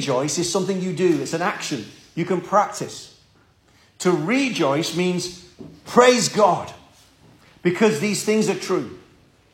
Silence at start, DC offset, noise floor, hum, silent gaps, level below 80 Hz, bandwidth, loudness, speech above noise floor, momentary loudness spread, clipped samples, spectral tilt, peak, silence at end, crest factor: 0 s; under 0.1%; -57 dBFS; none; none; -62 dBFS; 16.5 kHz; -21 LUFS; 36 dB; 15 LU; under 0.1%; -4.5 dB/octave; -2 dBFS; 0.55 s; 20 dB